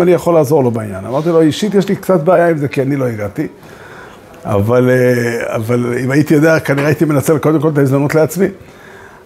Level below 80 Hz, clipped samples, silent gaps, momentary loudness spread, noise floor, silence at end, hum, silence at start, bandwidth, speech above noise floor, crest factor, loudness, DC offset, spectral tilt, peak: -50 dBFS; under 0.1%; none; 9 LU; -36 dBFS; 0.2 s; none; 0 s; 16 kHz; 24 dB; 12 dB; -13 LUFS; under 0.1%; -7 dB/octave; 0 dBFS